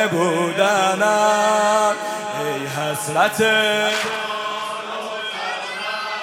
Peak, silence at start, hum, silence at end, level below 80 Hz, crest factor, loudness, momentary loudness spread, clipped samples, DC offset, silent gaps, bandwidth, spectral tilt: -4 dBFS; 0 s; none; 0 s; -70 dBFS; 16 dB; -19 LUFS; 9 LU; under 0.1%; under 0.1%; none; 16.5 kHz; -3 dB/octave